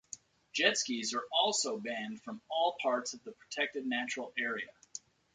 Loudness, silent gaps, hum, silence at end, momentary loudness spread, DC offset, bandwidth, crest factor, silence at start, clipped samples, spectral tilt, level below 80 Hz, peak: -34 LUFS; none; none; 0.35 s; 18 LU; under 0.1%; 9.6 kHz; 24 dB; 0.15 s; under 0.1%; -1 dB/octave; -82 dBFS; -12 dBFS